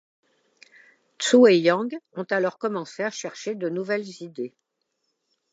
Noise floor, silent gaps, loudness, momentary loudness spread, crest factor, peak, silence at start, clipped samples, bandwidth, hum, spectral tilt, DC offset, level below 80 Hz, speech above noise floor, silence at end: -77 dBFS; none; -23 LUFS; 18 LU; 20 dB; -4 dBFS; 1.2 s; under 0.1%; 9 kHz; none; -4.5 dB/octave; under 0.1%; -82 dBFS; 54 dB; 1.05 s